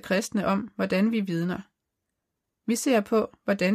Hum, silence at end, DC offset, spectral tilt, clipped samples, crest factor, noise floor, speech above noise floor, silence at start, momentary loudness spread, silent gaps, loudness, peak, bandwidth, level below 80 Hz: none; 0 s; under 0.1%; -5.5 dB/octave; under 0.1%; 16 dB; -83 dBFS; 58 dB; 0.05 s; 7 LU; none; -26 LUFS; -12 dBFS; 15.5 kHz; -64 dBFS